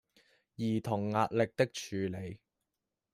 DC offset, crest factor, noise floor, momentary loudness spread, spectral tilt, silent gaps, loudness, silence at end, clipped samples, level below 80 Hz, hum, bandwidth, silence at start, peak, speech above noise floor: under 0.1%; 22 dB; -88 dBFS; 13 LU; -6 dB/octave; none; -34 LUFS; 0.75 s; under 0.1%; -70 dBFS; none; 15 kHz; 0.6 s; -14 dBFS; 55 dB